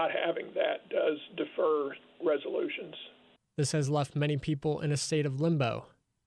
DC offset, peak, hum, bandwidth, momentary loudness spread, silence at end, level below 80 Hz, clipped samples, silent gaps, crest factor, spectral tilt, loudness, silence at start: under 0.1%; -18 dBFS; none; 12 kHz; 10 LU; 0.4 s; -66 dBFS; under 0.1%; none; 14 dB; -5.5 dB/octave; -32 LUFS; 0 s